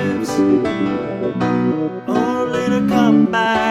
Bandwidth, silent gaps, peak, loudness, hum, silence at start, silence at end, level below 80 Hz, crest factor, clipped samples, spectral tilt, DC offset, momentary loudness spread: 14 kHz; none; -2 dBFS; -17 LUFS; none; 0 s; 0 s; -50 dBFS; 14 dB; under 0.1%; -6.5 dB/octave; under 0.1%; 7 LU